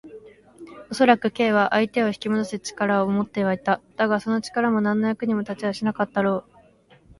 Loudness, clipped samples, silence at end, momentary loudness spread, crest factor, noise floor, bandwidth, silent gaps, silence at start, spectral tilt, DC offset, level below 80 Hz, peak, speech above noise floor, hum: -23 LUFS; under 0.1%; 0.8 s; 7 LU; 20 dB; -55 dBFS; 11.5 kHz; none; 0.05 s; -6 dB/octave; under 0.1%; -62 dBFS; -2 dBFS; 33 dB; none